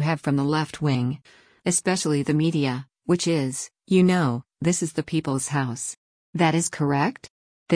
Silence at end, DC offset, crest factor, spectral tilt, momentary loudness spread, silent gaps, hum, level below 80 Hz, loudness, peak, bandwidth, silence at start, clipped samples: 0 s; under 0.1%; 16 dB; -5 dB/octave; 10 LU; 5.97-6.33 s, 7.30-7.66 s; none; -60 dBFS; -24 LUFS; -8 dBFS; 10.5 kHz; 0 s; under 0.1%